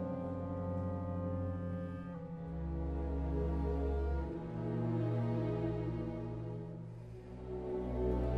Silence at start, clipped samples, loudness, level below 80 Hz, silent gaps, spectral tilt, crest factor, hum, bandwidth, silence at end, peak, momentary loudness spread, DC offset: 0 s; under 0.1%; -39 LUFS; -44 dBFS; none; -10.5 dB/octave; 14 dB; none; 5.4 kHz; 0 s; -24 dBFS; 9 LU; under 0.1%